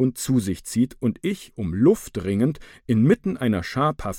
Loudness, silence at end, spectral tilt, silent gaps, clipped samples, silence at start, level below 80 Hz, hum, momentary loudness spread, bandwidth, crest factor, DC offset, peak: -23 LUFS; 0 s; -6.5 dB/octave; none; under 0.1%; 0 s; -46 dBFS; none; 9 LU; 17 kHz; 16 dB; under 0.1%; -6 dBFS